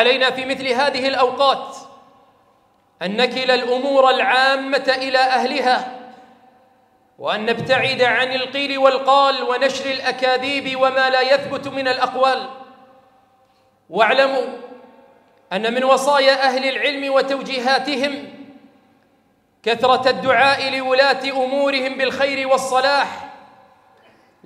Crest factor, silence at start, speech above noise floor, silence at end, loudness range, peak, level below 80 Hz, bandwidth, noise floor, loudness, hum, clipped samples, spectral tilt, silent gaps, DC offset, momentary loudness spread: 18 dB; 0 s; 42 dB; 1.1 s; 4 LU; 0 dBFS; -70 dBFS; 12.5 kHz; -60 dBFS; -17 LUFS; none; under 0.1%; -3 dB/octave; none; under 0.1%; 10 LU